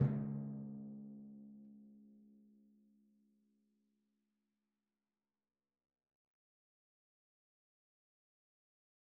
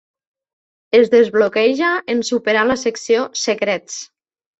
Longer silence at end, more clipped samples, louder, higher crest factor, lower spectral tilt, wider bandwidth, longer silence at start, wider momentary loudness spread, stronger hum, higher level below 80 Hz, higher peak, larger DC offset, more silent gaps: first, 6.8 s vs 0.55 s; neither; second, -46 LUFS vs -16 LUFS; first, 26 dB vs 16 dB; first, -11 dB/octave vs -3 dB/octave; second, 2.3 kHz vs 8.2 kHz; second, 0 s vs 0.95 s; first, 23 LU vs 8 LU; neither; second, -80 dBFS vs -58 dBFS; second, -22 dBFS vs -2 dBFS; neither; neither